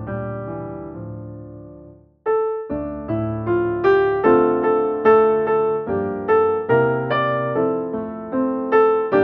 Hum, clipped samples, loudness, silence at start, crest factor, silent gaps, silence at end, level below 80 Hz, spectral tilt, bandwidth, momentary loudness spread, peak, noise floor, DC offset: none; under 0.1%; -19 LUFS; 0 s; 16 dB; none; 0 s; -50 dBFS; -6 dB/octave; 5.2 kHz; 16 LU; -4 dBFS; -44 dBFS; under 0.1%